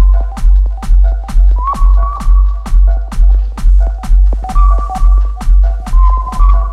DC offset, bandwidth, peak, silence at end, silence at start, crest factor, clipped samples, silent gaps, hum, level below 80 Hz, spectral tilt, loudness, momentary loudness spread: under 0.1%; 2.9 kHz; 0 dBFS; 0 s; 0 s; 8 dB; under 0.1%; none; none; -8 dBFS; -7.5 dB/octave; -13 LUFS; 2 LU